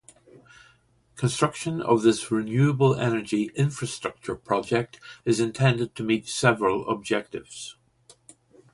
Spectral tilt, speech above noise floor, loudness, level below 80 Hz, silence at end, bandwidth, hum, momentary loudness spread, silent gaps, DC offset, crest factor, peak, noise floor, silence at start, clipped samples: -5.5 dB/octave; 37 dB; -25 LUFS; -60 dBFS; 1 s; 11.5 kHz; none; 12 LU; none; under 0.1%; 20 dB; -6 dBFS; -62 dBFS; 1.15 s; under 0.1%